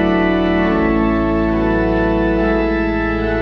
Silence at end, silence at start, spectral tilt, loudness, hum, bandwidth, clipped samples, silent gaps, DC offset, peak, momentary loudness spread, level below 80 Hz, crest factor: 0 s; 0 s; -8.5 dB/octave; -16 LUFS; none; 6 kHz; under 0.1%; none; under 0.1%; -4 dBFS; 2 LU; -26 dBFS; 12 dB